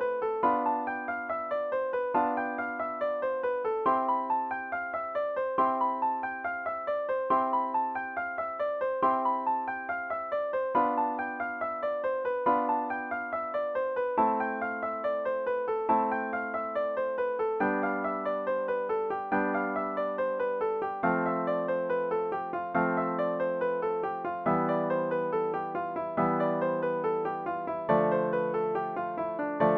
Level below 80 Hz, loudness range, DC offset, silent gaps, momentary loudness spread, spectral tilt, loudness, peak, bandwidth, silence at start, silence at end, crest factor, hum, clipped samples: -68 dBFS; 1 LU; under 0.1%; none; 6 LU; -9 dB/octave; -30 LUFS; -12 dBFS; 5 kHz; 0 s; 0 s; 16 dB; none; under 0.1%